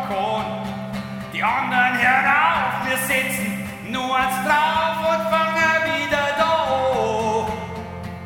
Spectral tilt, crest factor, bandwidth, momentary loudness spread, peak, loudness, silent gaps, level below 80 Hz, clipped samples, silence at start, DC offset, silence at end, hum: -4 dB/octave; 16 dB; 17 kHz; 12 LU; -4 dBFS; -20 LUFS; none; -50 dBFS; under 0.1%; 0 s; under 0.1%; 0 s; none